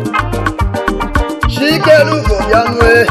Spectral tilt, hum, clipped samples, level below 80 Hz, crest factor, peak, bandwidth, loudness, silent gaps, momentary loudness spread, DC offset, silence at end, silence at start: -5.5 dB/octave; none; under 0.1%; -20 dBFS; 10 dB; 0 dBFS; 15.5 kHz; -11 LUFS; none; 8 LU; under 0.1%; 0 s; 0 s